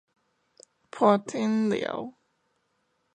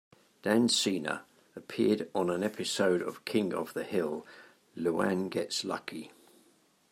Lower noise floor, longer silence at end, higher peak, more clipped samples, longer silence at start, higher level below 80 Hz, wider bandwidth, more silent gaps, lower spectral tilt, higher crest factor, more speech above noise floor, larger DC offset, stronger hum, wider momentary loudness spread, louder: first, -74 dBFS vs -66 dBFS; first, 1.05 s vs 0.8 s; first, -8 dBFS vs -12 dBFS; neither; first, 0.95 s vs 0.45 s; about the same, -74 dBFS vs -78 dBFS; second, 9.6 kHz vs 16 kHz; neither; first, -6 dB/octave vs -4 dB/octave; about the same, 22 dB vs 20 dB; first, 49 dB vs 35 dB; neither; neither; about the same, 17 LU vs 15 LU; first, -26 LUFS vs -31 LUFS